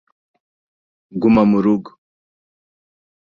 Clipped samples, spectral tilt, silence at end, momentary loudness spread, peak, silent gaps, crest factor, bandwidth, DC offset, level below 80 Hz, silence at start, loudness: under 0.1%; -9.5 dB/octave; 1.45 s; 10 LU; -2 dBFS; none; 18 dB; 5.2 kHz; under 0.1%; -52 dBFS; 1.15 s; -16 LUFS